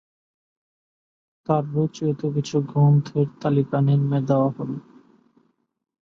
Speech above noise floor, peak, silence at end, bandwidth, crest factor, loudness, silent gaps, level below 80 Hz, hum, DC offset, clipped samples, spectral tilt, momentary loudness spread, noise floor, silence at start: 43 dB; -6 dBFS; 1.25 s; 7.4 kHz; 16 dB; -22 LUFS; none; -62 dBFS; none; under 0.1%; under 0.1%; -9 dB/octave; 10 LU; -64 dBFS; 1.5 s